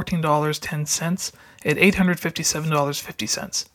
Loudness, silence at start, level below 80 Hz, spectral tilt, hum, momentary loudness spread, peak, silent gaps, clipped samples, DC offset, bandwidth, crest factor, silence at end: -22 LUFS; 0 s; -50 dBFS; -4 dB/octave; none; 10 LU; -2 dBFS; none; under 0.1%; under 0.1%; 18 kHz; 20 dB; 0.1 s